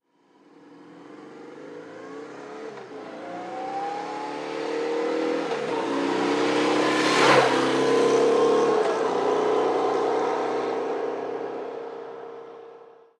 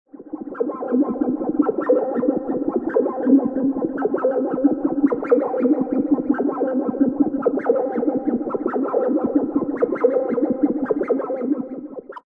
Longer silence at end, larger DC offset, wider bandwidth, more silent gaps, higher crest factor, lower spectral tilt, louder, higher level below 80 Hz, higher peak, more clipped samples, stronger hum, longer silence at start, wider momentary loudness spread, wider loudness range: first, 0.35 s vs 0.1 s; neither; first, 12 kHz vs 2.6 kHz; neither; about the same, 20 dB vs 16 dB; second, -4 dB/octave vs -11 dB/octave; second, -24 LUFS vs -21 LUFS; second, -76 dBFS vs -60 dBFS; about the same, -4 dBFS vs -4 dBFS; neither; neither; first, 0.65 s vs 0.15 s; first, 20 LU vs 5 LU; first, 15 LU vs 1 LU